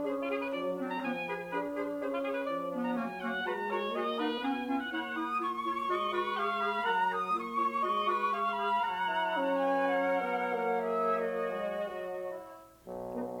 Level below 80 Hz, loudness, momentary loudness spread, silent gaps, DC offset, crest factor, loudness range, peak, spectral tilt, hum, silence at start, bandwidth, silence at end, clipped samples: -70 dBFS; -33 LUFS; 7 LU; none; under 0.1%; 14 dB; 4 LU; -18 dBFS; -5.5 dB/octave; none; 0 s; 18.5 kHz; 0 s; under 0.1%